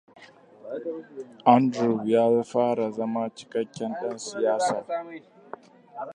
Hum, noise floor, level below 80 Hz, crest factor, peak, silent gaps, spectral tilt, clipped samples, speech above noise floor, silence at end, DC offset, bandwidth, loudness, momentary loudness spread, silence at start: none; -50 dBFS; -76 dBFS; 22 dB; -4 dBFS; none; -6 dB/octave; under 0.1%; 25 dB; 0 s; under 0.1%; 10.5 kHz; -25 LUFS; 24 LU; 0.2 s